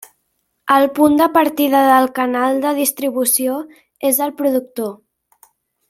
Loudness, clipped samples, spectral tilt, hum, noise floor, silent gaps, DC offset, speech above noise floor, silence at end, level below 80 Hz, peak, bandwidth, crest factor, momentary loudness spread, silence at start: -15 LUFS; under 0.1%; -2.5 dB/octave; none; -69 dBFS; none; under 0.1%; 54 dB; 0.95 s; -60 dBFS; 0 dBFS; 16.5 kHz; 16 dB; 14 LU; 0.65 s